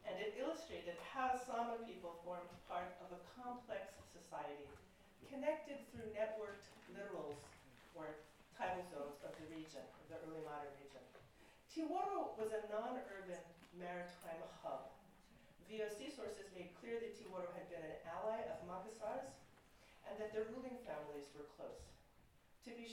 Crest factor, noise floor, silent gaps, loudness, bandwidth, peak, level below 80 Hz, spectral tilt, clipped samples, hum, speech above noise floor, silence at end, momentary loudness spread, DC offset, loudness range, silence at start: 20 dB; -71 dBFS; none; -49 LUFS; 16 kHz; -28 dBFS; -74 dBFS; -5 dB/octave; under 0.1%; none; 22 dB; 0 s; 17 LU; under 0.1%; 5 LU; 0 s